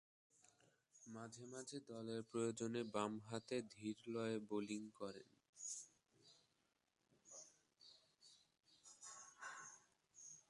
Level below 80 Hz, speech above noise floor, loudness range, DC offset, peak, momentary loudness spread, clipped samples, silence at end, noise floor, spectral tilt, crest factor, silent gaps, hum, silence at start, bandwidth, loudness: -90 dBFS; 38 dB; 14 LU; under 0.1%; -28 dBFS; 21 LU; under 0.1%; 0.1 s; -86 dBFS; -4.5 dB/octave; 24 dB; 5.49-5.53 s; none; 0.95 s; 11.5 kHz; -50 LUFS